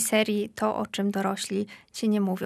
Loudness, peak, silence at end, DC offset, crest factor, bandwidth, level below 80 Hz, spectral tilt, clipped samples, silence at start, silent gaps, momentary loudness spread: -28 LUFS; -10 dBFS; 0 s; under 0.1%; 18 dB; 14.5 kHz; -68 dBFS; -4.5 dB/octave; under 0.1%; 0 s; none; 6 LU